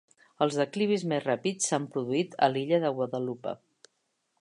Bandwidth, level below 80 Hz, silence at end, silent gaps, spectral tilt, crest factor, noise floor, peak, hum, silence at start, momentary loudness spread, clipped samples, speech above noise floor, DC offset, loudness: 11.5 kHz; -80 dBFS; 0.85 s; none; -4.5 dB/octave; 20 dB; -77 dBFS; -10 dBFS; none; 0.4 s; 8 LU; under 0.1%; 49 dB; under 0.1%; -29 LUFS